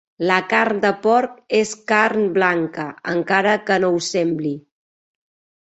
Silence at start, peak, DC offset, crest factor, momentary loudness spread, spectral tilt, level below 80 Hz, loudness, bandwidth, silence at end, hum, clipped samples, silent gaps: 0.2 s; -2 dBFS; under 0.1%; 18 dB; 8 LU; -4.5 dB/octave; -64 dBFS; -19 LUFS; 8.2 kHz; 1.05 s; none; under 0.1%; none